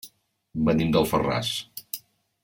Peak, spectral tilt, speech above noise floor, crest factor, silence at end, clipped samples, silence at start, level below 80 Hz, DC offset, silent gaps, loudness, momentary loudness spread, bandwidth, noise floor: -8 dBFS; -5.5 dB/octave; 31 dB; 18 dB; 0.45 s; under 0.1%; 0.05 s; -50 dBFS; under 0.1%; none; -25 LUFS; 15 LU; 17 kHz; -54 dBFS